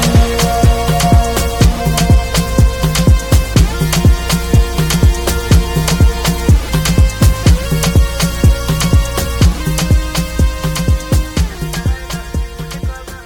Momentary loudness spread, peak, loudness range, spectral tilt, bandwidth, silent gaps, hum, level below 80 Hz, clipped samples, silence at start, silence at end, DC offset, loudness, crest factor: 7 LU; 0 dBFS; 3 LU; -5 dB/octave; 19 kHz; none; none; -14 dBFS; under 0.1%; 0 s; 0 s; under 0.1%; -13 LUFS; 12 dB